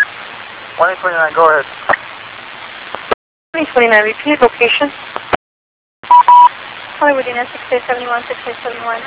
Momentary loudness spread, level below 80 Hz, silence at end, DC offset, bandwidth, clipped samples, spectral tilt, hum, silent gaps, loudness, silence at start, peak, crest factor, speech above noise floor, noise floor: 19 LU; -52 dBFS; 0 s; under 0.1%; 4 kHz; 0.4%; -7 dB/octave; none; 3.14-3.53 s, 5.36-6.03 s; -13 LUFS; 0 s; 0 dBFS; 14 dB; 17 dB; -30 dBFS